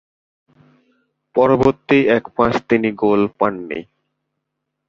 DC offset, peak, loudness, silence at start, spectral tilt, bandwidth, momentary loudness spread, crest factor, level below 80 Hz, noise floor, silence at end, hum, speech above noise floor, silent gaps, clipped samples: under 0.1%; -2 dBFS; -17 LUFS; 1.35 s; -7.5 dB/octave; 7.4 kHz; 10 LU; 18 dB; -48 dBFS; -77 dBFS; 1.05 s; none; 61 dB; none; under 0.1%